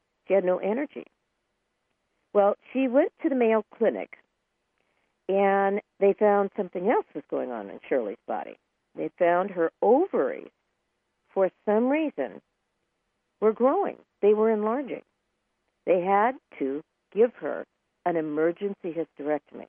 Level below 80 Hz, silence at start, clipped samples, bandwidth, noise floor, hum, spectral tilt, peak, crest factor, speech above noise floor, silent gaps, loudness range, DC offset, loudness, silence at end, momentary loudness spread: -80 dBFS; 0.3 s; under 0.1%; 3.5 kHz; -78 dBFS; none; -10 dB/octave; -10 dBFS; 18 dB; 52 dB; none; 3 LU; under 0.1%; -26 LUFS; 0.05 s; 13 LU